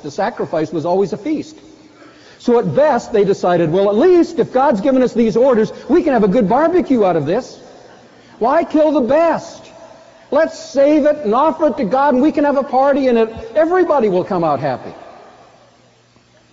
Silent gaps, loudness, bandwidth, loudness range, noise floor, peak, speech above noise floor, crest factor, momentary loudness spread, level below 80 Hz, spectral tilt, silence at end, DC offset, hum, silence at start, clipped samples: none; -15 LUFS; 7.8 kHz; 4 LU; -51 dBFS; -4 dBFS; 37 dB; 12 dB; 8 LU; -50 dBFS; -6 dB/octave; 1.5 s; under 0.1%; none; 0.05 s; under 0.1%